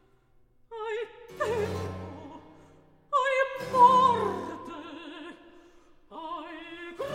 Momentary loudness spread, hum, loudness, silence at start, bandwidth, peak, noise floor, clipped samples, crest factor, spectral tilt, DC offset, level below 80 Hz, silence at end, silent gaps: 24 LU; none; -27 LUFS; 0.7 s; 15.5 kHz; -8 dBFS; -62 dBFS; under 0.1%; 22 dB; -5 dB/octave; under 0.1%; -64 dBFS; 0 s; none